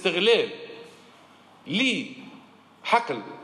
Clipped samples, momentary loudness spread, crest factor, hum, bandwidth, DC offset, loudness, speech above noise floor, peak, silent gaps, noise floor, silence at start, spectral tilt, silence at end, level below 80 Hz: under 0.1%; 23 LU; 20 dB; none; 11.5 kHz; under 0.1%; -24 LUFS; 29 dB; -8 dBFS; none; -53 dBFS; 0 s; -4 dB/octave; 0 s; -80 dBFS